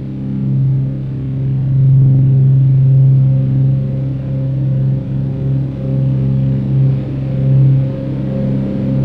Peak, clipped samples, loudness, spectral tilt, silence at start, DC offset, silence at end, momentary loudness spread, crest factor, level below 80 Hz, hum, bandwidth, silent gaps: -4 dBFS; under 0.1%; -14 LUFS; -12 dB/octave; 0 s; under 0.1%; 0 s; 9 LU; 10 dB; -34 dBFS; none; 3 kHz; none